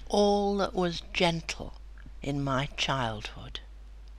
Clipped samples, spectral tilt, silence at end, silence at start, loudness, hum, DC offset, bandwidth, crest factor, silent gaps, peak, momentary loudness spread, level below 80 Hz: under 0.1%; -5 dB/octave; 0 s; 0 s; -30 LUFS; none; under 0.1%; 13 kHz; 20 dB; none; -12 dBFS; 17 LU; -44 dBFS